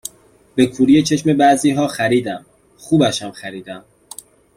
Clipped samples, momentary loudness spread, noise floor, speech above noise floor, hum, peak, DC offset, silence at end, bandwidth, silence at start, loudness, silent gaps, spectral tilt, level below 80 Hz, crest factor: under 0.1%; 23 LU; -50 dBFS; 34 dB; none; -2 dBFS; under 0.1%; 0.8 s; 15.5 kHz; 0.55 s; -16 LUFS; none; -5 dB/octave; -54 dBFS; 16 dB